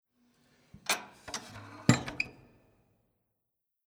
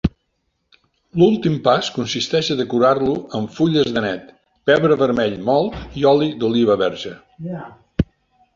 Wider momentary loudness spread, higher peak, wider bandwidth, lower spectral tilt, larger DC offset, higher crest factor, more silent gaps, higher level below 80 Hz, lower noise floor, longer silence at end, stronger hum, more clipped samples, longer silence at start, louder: about the same, 13 LU vs 14 LU; second, -8 dBFS vs -2 dBFS; first, 20 kHz vs 7.6 kHz; second, -4 dB/octave vs -6 dB/octave; neither; first, 30 dB vs 16 dB; neither; second, -62 dBFS vs -42 dBFS; first, -85 dBFS vs -70 dBFS; first, 1.55 s vs 0.5 s; neither; neither; first, 0.9 s vs 0.05 s; second, -33 LUFS vs -18 LUFS